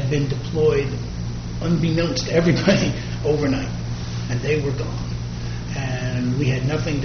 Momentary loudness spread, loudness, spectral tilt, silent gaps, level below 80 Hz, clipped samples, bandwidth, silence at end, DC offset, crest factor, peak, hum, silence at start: 10 LU; -22 LUFS; -6 dB/octave; none; -34 dBFS; under 0.1%; 6.6 kHz; 0 s; under 0.1%; 20 dB; -2 dBFS; none; 0 s